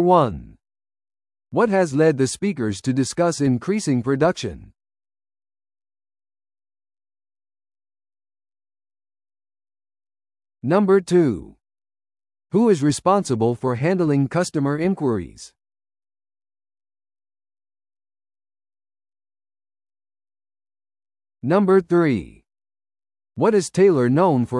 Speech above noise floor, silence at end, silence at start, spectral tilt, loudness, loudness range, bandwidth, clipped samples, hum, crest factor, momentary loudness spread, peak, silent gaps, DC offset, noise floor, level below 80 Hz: over 71 dB; 0 s; 0 s; -6.5 dB/octave; -19 LUFS; 8 LU; 12 kHz; under 0.1%; none; 20 dB; 10 LU; -2 dBFS; none; under 0.1%; under -90 dBFS; -56 dBFS